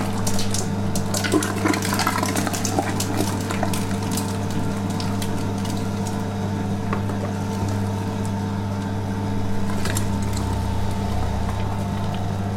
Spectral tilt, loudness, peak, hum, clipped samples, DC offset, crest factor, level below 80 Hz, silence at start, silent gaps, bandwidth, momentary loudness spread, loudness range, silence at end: -5 dB/octave; -24 LUFS; -6 dBFS; none; under 0.1%; under 0.1%; 16 dB; -36 dBFS; 0 s; none; 17 kHz; 5 LU; 3 LU; 0 s